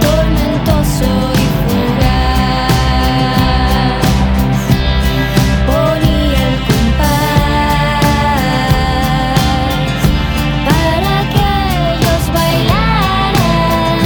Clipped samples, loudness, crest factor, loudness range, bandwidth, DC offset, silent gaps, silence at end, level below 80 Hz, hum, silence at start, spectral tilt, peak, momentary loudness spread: under 0.1%; -12 LUFS; 12 dB; 1 LU; over 20 kHz; under 0.1%; none; 0 s; -18 dBFS; none; 0 s; -5.5 dB/octave; 0 dBFS; 2 LU